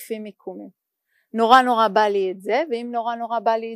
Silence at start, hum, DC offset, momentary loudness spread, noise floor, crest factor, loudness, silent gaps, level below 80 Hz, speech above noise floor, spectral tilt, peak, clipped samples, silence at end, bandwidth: 0 s; none; under 0.1%; 21 LU; -70 dBFS; 20 dB; -19 LUFS; none; -70 dBFS; 50 dB; -4.5 dB/octave; 0 dBFS; under 0.1%; 0 s; 15.5 kHz